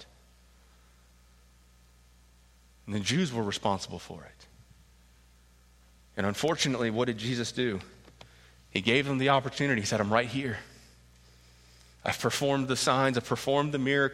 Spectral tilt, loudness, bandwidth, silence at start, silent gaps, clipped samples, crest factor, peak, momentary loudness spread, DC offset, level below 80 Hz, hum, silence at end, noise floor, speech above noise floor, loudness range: -4.5 dB/octave; -29 LUFS; 16 kHz; 0 s; none; under 0.1%; 24 dB; -6 dBFS; 14 LU; under 0.1%; -60 dBFS; 60 Hz at -55 dBFS; 0 s; -60 dBFS; 31 dB; 7 LU